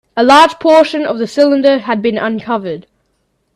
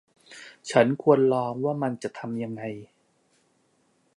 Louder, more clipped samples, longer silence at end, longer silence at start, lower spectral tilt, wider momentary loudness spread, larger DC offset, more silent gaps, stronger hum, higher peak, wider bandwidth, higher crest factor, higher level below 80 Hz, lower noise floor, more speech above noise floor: first, -11 LUFS vs -25 LUFS; neither; second, 0.75 s vs 1.3 s; second, 0.15 s vs 0.3 s; second, -4.5 dB/octave vs -6.5 dB/octave; second, 12 LU vs 21 LU; neither; neither; neither; first, 0 dBFS vs -6 dBFS; first, 13 kHz vs 11 kHz; second, 12 dB vs 22 dB; first, -54 dBFS vs -72 dBFS; second, -63 dBFS vs -68 dBFS; first, 52 dB vs 43 dB